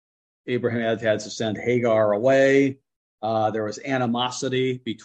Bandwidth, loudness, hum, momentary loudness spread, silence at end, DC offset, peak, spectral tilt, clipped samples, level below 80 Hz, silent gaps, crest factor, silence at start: 9 kHz; -23 LUFS; none; 9 LU; 0 s; under 0.1%; -6 dBFS; -5.5 dB/octave; under 0.1%; -66 dBFS; 2.96-3.18 s; 16 dB; 0.45 s